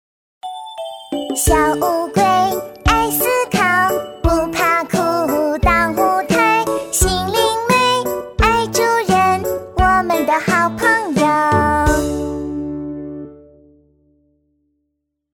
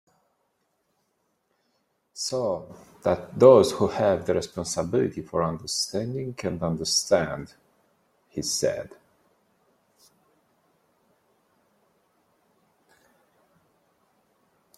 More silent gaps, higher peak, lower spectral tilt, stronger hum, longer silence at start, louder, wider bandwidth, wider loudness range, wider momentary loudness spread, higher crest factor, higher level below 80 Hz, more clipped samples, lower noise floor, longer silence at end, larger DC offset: neither; about the same, 0 dBFS vs -2 dBFS; about the same, -4 dB/octave vs -4.5 dB/octave; neither; second, 0.45 s vs 2.15 s; first, -16 LUFS vs -24 LUFS; first, 19 kHz vs 14.5 kHz; second, 4 LU vs 11 LU; second, 12 LU vs 17 LU; second, 16 dB vs 26 dB; first, -30 dBFS vs -60 dBFS; neither; about the same, -73 dBFS vs -74 dBFS; second, 1.95 s vs 5.9 s; neither